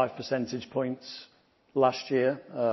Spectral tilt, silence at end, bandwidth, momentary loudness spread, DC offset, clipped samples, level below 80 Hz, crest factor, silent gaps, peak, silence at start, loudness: -6 dB/octave; 0 s; 6.2 kHz; 13 LU; under 0.1%; under 0.1%; -72 dBFS; 20 dB; none; -10 dBFS; 0 s; -30 LUFS